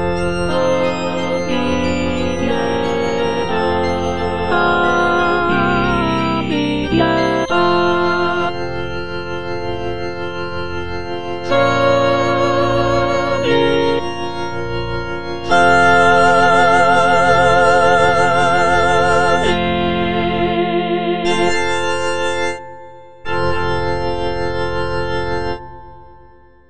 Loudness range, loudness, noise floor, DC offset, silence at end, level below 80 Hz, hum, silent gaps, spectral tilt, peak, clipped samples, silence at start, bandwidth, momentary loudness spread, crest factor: 9 LU; -16 LUFS; -46 dBFS; 4%; 0 s; -36 dBFS; none; none; -5.5 dB/octave; 0 dBFS; under 0.1%; 0 s; 10.5 kHz; 12 LU; 16 dB